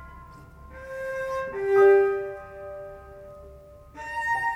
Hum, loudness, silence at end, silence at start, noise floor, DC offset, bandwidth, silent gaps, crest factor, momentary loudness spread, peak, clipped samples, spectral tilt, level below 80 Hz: none; -24 LUFS; 0 s; 0 s; -47 dBFS; under 0.1%; 9.8 kHz; none; 18 dB; 27 LU; -8 dBFS; under 0.1%; -6 dB/octave; -52 dBFS